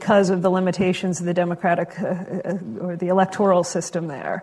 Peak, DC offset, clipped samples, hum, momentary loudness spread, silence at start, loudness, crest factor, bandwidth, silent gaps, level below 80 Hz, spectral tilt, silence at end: -4 dBFS; under 0.1%; under 0.1%; none; 9 LU; 0 s; -22 LUFS; 18 dB; 11.5 kHz; none; -60 dBFS; -6 dB/octave; 0 s